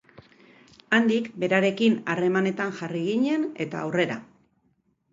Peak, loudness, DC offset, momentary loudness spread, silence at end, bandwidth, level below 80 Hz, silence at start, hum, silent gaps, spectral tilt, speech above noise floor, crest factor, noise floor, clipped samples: -6 dBFS; -25 LUFS; under 0.1%; 8 LU; 0.9 s; 7.8 kHz; -72 dBFS; 0.9 s; none; none; -6 dB/octave; 45 dB; 20 dB; -69 dBFS; under 0.1%